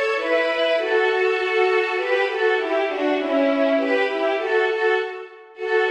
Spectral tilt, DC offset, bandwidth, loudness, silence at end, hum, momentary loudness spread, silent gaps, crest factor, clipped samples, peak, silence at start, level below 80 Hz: -2.5 dB/octave; under 0.1%; 9.6 kHz; -20 LUFS; 0 s; none; 4 LU; none; 12 dB; under 0.1%; -8 dBFS; 0 s; -70 dBFS